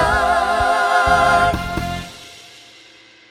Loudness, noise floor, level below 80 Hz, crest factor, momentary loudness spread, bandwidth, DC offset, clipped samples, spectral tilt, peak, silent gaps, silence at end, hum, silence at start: -16 LUFS; -46 dBFS; -34 dBFS; 16 dB; 20 LU; 15.5 kHz; under 0.1%; under 0.1%; -4 dB/octave; -2 dBFS; none; 0.9 s; none; 0 s